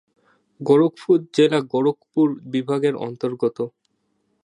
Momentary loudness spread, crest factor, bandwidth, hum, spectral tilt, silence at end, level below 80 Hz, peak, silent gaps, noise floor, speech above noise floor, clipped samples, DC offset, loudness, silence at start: 10 LU; 18 dB; 10.5 kHz; none; -7 dB/octave; 0.8 s; -74 dBFS; -4 dBFS; none; -70 dBFS; 50 dB; under 0.1%; under 0.1%; -21 LUFS; 0.6 s